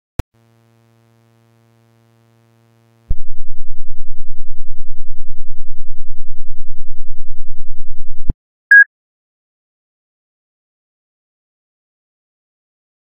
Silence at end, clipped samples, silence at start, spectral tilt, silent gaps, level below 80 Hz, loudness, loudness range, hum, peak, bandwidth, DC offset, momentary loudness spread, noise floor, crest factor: 4.3 s; 0.2%; 3.1 s; -6 dB/octave; 8.34-8.70 s; -24 dBFS; -12 LUFS; 22 LU; none; 0 dBFS; 1.9 kHz; under 0.1%; 27 LU; -53 dBFS; 8 dB